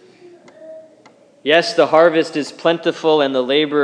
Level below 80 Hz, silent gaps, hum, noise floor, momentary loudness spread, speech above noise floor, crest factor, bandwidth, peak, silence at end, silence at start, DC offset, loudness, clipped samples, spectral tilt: -76 dBFS; none; none; -49 dBFS; 7 LU; 34 dB; 16 dB; 10.5 kHz; 0 dBFS; 0 s; 0.6 s; under 0.1%; -16 LUFS; under 0.1%; -4.5 dB/octave